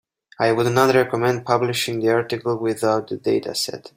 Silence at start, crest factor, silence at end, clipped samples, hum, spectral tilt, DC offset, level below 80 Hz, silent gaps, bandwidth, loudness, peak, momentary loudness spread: 0.4 s; 18 dB; 0.1 s; under 0.1%; none; -5 dB/octave; under 0.1%; -60 dBFS; none; 16 kHz; -20 LUFS; -2 dBFS; 6 LU